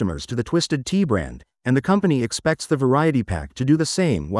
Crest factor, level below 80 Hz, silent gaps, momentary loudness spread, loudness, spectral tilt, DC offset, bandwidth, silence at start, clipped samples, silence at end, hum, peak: 14 dB; -44 dBFS; none; 7 LU; -21 LUFS; -6 dB/octave; under 0.1%; 12 kHz; 0 s; under 0.1%; 0 s; none; -6 dBFS